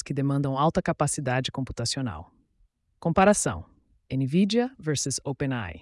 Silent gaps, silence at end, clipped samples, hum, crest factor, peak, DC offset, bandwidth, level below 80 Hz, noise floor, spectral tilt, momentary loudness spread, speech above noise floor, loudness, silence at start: none; 0 s; under 0.1%; none; 18 dB; -8 dBFS; under 0.1%; 12 kHz; -52 dBFS; -67 dBFS; -5 dB/octave; 11 LU; 41 dB; -26 LUFS; 0.05 s